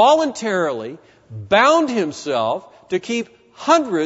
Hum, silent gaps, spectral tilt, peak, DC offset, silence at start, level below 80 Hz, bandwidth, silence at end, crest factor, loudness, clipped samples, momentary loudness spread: none; none; -4 dB/octave; 0 dBFS; under 0.1%; 0 s; -60 dBFS; 8 kHz; 0 s; 18 dB; -19 LUFS; under 0.1%; 17 LU